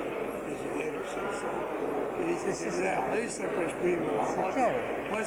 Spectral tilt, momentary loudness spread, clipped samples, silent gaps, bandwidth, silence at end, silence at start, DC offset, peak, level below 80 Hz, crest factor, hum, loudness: -5 dB/octave; 6 LU; under 0.1%; none; 19.5 kHz; 0 s; 0 s; under 0.1%; -16 dBFS; -60 dBFS; 16 dB; none; -31 LUFS